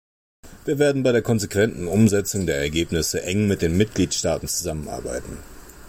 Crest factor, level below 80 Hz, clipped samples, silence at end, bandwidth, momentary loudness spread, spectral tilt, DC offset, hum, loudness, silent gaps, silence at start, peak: 16 dB; -42 dBFS; under 0.1%; 0 s; 16.5 kHz; 11 LU; -5 dB/octave; under 0.1%; none; -22 LUFS; none; 0.45 s; -6 dBFS